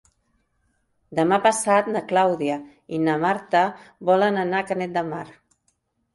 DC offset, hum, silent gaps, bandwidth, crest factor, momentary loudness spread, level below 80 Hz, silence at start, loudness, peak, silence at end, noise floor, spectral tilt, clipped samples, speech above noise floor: under 0.1%; none; none; 11.5 kHz; 18 dB; 12 LU; -66 dBFS; 1.1 s; -22 LUFS; -6 dBFS; 0.85 s; -70 dBFS; -5 dB/octave; under 0.1%; 49 dB